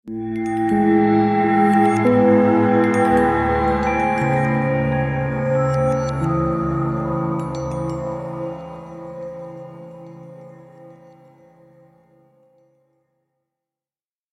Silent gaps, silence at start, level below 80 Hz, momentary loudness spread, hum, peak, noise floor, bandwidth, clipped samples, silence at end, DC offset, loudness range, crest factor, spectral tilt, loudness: none; 0.05 s; -40 dBFS; 19 LU; none; -4 dBFS; under -90 dBFS; 12 kHz; under 0.1%; 3.4 s; under 0.1%; 19 LU; 16 dB; -8 dB/octave; -18 LUFS